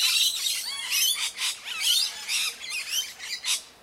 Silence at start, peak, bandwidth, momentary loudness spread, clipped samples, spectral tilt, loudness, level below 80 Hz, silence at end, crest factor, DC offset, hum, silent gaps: 0 s; -10 dBFS; 16 kHz; 7 LU; under 0.1%; 4.5 dB/octave; -25 LUFS; -72 dBFS; 0.1 s; 18 dB; under 0.1%; none; none